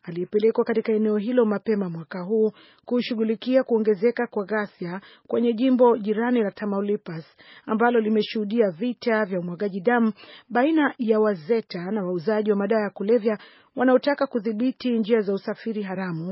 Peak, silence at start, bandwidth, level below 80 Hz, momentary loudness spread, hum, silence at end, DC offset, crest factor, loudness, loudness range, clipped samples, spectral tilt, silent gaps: -6 dBFS; 0.05 s; 5.8 kHz; -76 dBFS; 9 LU; none; 0 s; under 0.1%; 18 dB; -23 LUFS; 2 LU; under 0.1%; -5 dB/octave; none